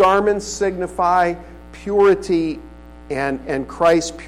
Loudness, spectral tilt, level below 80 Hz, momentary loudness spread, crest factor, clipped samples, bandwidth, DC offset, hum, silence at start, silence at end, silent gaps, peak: -18 LUFS; -5 dB/octave; -42 dBFS; 15 LU; 12 dB; under 0.1%; 12.5 kHz; 0.3%; 60 Hz at -40 dBFS; 0 s; 0 s; none; -6 dBFS